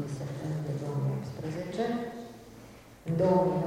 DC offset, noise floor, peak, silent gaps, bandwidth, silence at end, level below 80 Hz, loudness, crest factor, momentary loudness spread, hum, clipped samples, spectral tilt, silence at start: under 0.1%; -51 dBFS; -12 dBFS; none; 16 kHz; 0 s; -60 dBFS; -32 LUFS; 18 dB; 23 LU; none; under 0.1%; -8 dB/octave; 0 s